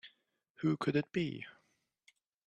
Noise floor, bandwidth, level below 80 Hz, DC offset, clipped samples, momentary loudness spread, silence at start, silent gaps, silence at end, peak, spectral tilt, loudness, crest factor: -78 dBFS; 9.6 kHz; -74 dBFS; under 0.1%; under 0.1%; 17 LU; 0.05 s; 0.50-0.54 s; 0.95 s; -18 dBFS; -7.5 dB/octave; -36 LUFS; 20 dB